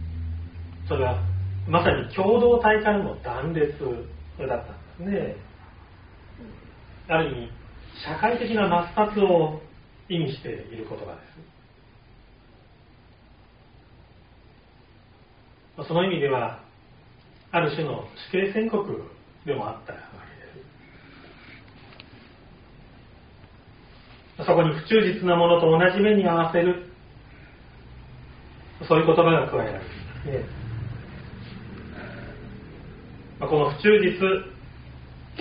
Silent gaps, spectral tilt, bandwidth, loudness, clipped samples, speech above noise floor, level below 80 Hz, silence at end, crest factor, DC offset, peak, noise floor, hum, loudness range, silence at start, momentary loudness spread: none; -5 dB/octave; 5.2 kHz; -23 LUFS; under 0.1%; 31 dB; -48 dBFS; 0 s; 22 dB; under 0.1%; -4 dBFS; -54 dBFS; none; 15 LU; 0 s; 26 LU